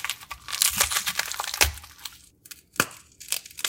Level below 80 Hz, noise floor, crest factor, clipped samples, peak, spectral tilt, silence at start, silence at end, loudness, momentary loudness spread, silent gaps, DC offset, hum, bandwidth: -44 dBFS; -49 dBFS; 28 dB; under 0.1%; 0 dBFS; 0 dB/octave; 0 s; 0 s; -25 LUFS; 19 LU; none; under 0.1%; none; 17 kHz